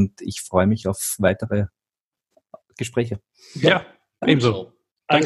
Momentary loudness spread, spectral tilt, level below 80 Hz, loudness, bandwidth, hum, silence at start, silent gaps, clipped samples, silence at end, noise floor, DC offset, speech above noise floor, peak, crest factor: 13 LU; -5 dB/octave; -54 dBFS; -22 LUFS; 13 kHz; none; 0 s; 2.00-2.12 s, 4.91-4.95 s; under 0.1%; 0 s; -90 dBFS; under 0.1%; 69 dB; -2 dBFS; 20 dB